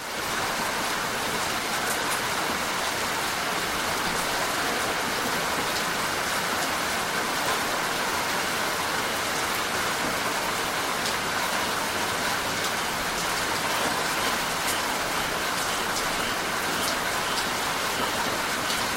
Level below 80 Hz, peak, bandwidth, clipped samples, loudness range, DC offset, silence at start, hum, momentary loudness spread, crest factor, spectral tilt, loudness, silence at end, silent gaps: -52 dBFS; -8 dBFS; 16 kHz; under 0.1%; 0 LU; under 0.1%; 0 s; none; 1 LU; 18 dB; -1.5 dB/octave; -25 LUFS; 0 s; none